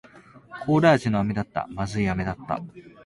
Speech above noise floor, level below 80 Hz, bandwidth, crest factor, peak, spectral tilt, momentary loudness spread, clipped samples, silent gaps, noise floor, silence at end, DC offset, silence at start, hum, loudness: 25 dB; -48 dBFS; 11.5 kHz; 20 dB; -4 dBFS; -7 dB/octave; 15 LU; under 0.1%; none; -49 dBFS; 0.15 s; under 0.1%; 0.15 s; none; -24 LUFS